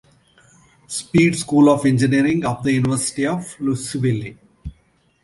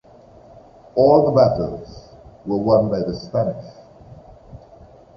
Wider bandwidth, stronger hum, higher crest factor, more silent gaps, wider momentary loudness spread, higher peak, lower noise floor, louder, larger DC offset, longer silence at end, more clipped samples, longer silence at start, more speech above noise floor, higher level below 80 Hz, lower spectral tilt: first, 11.5 kHz vs 6.2 kHz; neither; about the same, 18 dB vs 20 dB; neither; about the same, 21 LU vs 21 LU; about the same, -2 dBFS vs -2 dBFS; first, -60 dBFS vs -46 dBFS; about the same, -18 LUFS vs -18 LUFS; neither; about the same, 0.55 s vs 0.6 s; neither; about the same, 0.9 s vs 0.95 s; first, 42 dB vs 29 dB; about the same, -46 dBFS vs -46 dBFS; second, -5.5 dB/octave vs -9 dB/octave